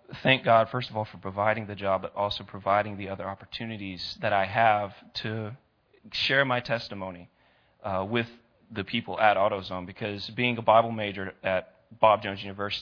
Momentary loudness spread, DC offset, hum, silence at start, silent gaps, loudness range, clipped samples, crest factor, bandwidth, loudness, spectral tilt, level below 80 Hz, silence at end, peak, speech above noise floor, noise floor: 14 LU; under 0.1%; none; 0.1 s; none; 3 LU; under 0.1%; 24 dB; 5.4 kHz; -27 LUFS; -6.5 dB/octave; -64 dBFS; 0 s; -4 dBFS; 35 dB; -62 dBFS